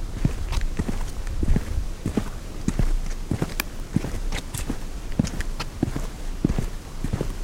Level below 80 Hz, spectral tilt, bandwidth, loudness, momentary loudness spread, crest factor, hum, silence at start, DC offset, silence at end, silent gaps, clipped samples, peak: -28 dBFS; -5.5 dB/octave; 16.5 kHz; -29 LUFS; 7 LU; 22 dB; none; 0 s; under 0.1%; 0 s; none; under 0.1%; -2 dBFS